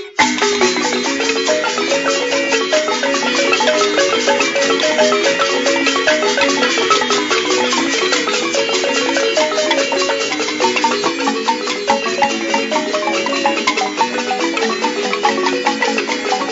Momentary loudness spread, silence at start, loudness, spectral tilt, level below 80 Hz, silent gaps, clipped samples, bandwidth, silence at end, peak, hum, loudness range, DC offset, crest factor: 4 LU; 0 s; -15 LUFS; -1.5 dB/octave; -58 dBFS; none; under 0.1%; 8 kHz; 0 s; 0 dBFS; none; 3 LU; under 0.1%; 16 dB